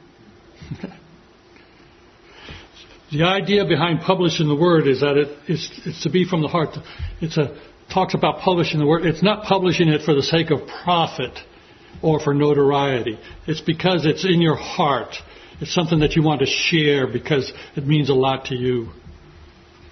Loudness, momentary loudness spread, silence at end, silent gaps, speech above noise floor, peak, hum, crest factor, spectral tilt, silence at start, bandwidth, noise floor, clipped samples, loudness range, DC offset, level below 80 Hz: -19 LUFS; 15 LU; 0.75 s; none; 30 dB; 0 dBFS; none; 20 dB; -6 dB/octave; 0.6 s; 6.4 kHz; -49 dBFS; under 0.1%; 4 LU; under 0.1%; -46 dBFS